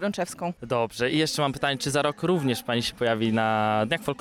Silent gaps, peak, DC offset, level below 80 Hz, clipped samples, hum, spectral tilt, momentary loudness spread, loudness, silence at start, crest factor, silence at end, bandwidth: none; -10 dBFS; under 0.1%; -56 dBFS; under 0.1%; none; -4.5 dB/octave; 5 LU; -25 LUFS; 0 s; 14 dB; 0.05 s; 18 kHz